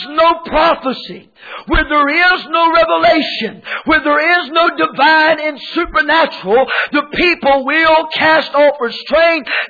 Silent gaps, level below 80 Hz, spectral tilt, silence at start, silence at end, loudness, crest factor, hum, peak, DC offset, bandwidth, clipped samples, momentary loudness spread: none; -34 dBFS; -5.5 dB/octave; 0 s; 0 s; -12 LUFS; 12 dB; none; -2 dBFS; under 0.1%; 4.9 kHz; under 0.1%; 9 LU